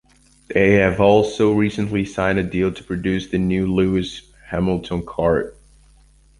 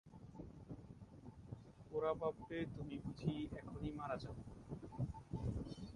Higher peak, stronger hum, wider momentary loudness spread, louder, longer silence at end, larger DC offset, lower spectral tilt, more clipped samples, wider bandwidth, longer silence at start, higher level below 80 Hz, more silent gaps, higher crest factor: first, 0 dBFS vs -26 dBFS; neither; second, 10 LU vs 14 LU; first, -19 LUFS vs -47 LUFS; first, 0.9 s vs 0 s; neither; about the same, -7 dB/octave vs -8 dB/octave; neither; about the same, 11.5 kHz vs 11 kHz; first, 0.5 s vs 0.05 s; first, -40 dBFS vs -60 dBFS; neither; about the same, 18 dB vs 20 dB